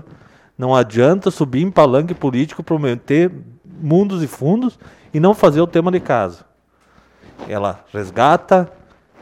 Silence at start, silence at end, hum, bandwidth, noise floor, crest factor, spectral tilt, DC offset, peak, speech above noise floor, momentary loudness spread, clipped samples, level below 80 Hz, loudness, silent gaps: 0.6 s; 0.55 s; none; 16 kHz; -56 dBFS; 16 dB; -7.5 dB/octave; under 0.1%; 0 dBFS; 40 dB; 12 LU; under 0.1%; -52 dBFS; -16 LUFS; none